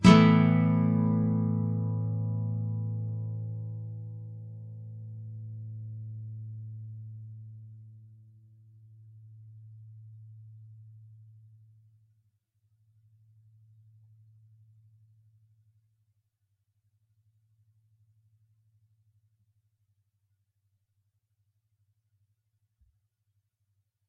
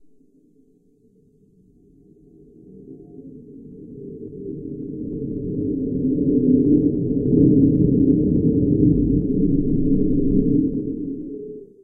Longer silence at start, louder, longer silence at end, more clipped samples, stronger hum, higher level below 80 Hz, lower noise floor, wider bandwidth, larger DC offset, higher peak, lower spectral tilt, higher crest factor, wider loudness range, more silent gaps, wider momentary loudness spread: second, 0 s vs 2.75 s; second, -29 LUFS vs -19 LUFS; first, 13 s vs 0.2 s; neither; neither; second, -60 dBFS vs -34 dBFS; first, -78 dBFS vs -57 dBFS; first, 5.4 kHz vs 0.9 kHz; neither; about the same, -6 dBFS vs -4 dBFS; second, -7 dB/octave vs -16.5 dB/octave; first, 28 dB vs 18 dB; first, 24 LU vs 18 LU; neither; first, 27 LU vs 22 LU